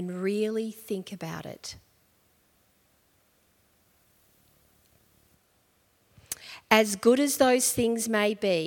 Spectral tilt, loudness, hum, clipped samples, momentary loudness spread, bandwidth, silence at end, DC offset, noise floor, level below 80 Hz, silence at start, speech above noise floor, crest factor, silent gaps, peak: -3.5 dB/octave; -26 LUFS; none; under 0.1%; 17 LU; 18 kHz; 0 s; under 0.1%; -67 dBFS; -66 dBFS; 0 s; 41 dB; 26 dB; none; -4 dBFS